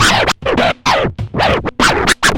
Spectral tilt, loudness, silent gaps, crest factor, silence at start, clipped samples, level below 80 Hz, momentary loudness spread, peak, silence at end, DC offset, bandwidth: -3 dB/octave; -13 LUFS; none; 14 dB; 0 s; under 0.1%; -30 dBFS; 5 LU; 0 dBFS; 0 s; under 0.1%; 17 kHz